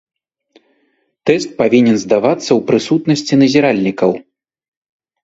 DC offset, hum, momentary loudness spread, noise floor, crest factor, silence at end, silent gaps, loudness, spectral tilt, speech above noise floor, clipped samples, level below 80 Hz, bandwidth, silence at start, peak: under 0.1%; none; 6 LU; -62 dBFS; 14 dB; 1.05 s; none; -13 LUFS; -5.5 dB/octave; 50 dB; under 0.1%; -56 dBFS; 8 kHz; 1.25 s; 0 dBFS